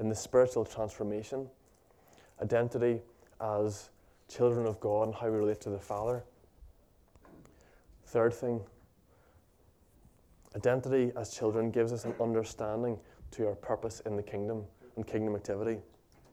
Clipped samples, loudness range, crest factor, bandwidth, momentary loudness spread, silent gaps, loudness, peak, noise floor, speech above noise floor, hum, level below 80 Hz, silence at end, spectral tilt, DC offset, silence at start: under 0.1%; 5 LU; 20 dB; 15 kHz; 12 LU; none; -33 LUFS; -14 dBFS; -65 dBFS; 33 dB; none; -64 dBFS; 0.5 s; -6.5 dB/octave; under 0.1%; 0 s